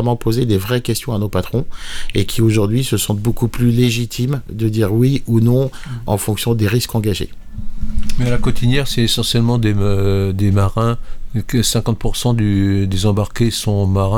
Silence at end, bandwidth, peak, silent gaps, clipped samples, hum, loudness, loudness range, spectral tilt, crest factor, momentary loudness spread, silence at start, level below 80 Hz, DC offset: 0 s; 18.5 kHz; -2 dBFS; none; under 0.1%; none; -17 LUFS; 2 LU; -6 dB/octave; 12 dB; 8 LU; 0 s; -26 dBFS; under 0.1%